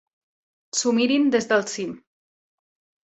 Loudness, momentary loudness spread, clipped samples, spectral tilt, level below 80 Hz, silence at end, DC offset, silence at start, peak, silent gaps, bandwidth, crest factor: -22 LUFS; 11 LU; under 0.1%; -3 dB/octave; -70 dBFS; 1.05 s; under 0.1%; 0.75 s; -6 dBFS; none; 8.2 kHz; 20 dB